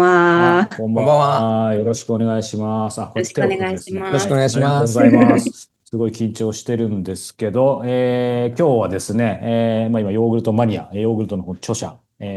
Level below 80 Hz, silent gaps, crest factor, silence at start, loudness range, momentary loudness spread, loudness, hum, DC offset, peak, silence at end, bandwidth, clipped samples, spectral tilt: -56 dBFS; none; 16 dB; 0 s; 3 LU; 12 LU; -18 LUFS; none; under 0.1%; 0 dBFS; 0 s; 12.5 kHz; under 0.1%; -6.5 dB/octave